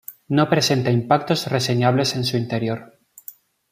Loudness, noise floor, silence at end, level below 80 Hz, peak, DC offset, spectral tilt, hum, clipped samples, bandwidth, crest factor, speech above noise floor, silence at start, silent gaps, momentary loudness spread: -20 LUFS; -44 dBFS; 0.85 s; -60 dBFS; -2 dBFS; under 0.1%; -5 dB/octave; none; under 0.1%; 15.5 kHz; 18 dB; 25 dB; 0.1 s; none; 21 LU